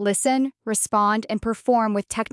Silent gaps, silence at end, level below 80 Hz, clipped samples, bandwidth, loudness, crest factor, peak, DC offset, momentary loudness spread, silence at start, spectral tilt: none; 0.1 s; -52 dBFS; under 0.1%; 12 kHz; -22 LUFS; 14 dB; -8 dBFS; under 0.1%; 5 LU; 0 s; -4 dB/octave